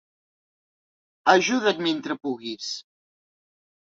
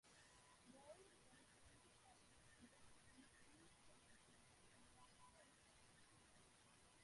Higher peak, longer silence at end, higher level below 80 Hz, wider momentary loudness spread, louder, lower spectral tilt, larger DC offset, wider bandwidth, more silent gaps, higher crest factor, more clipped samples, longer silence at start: first, -2 dBFS vs -52 dBFS; first, 1.15 s vs 0 s; first, -74 dBFS vs -82 dBFS; first, 13 LU vs 4 LU; first, -24 LUFS vs -69 LUFS; about the same, -3 dB/octave vs -3 dB/octave; neither; second, 7.8 kHz vs 11.5 kHz; neither; first, 26 dB vs 18 dB; neither; first, 1.25 s vs 0.05 s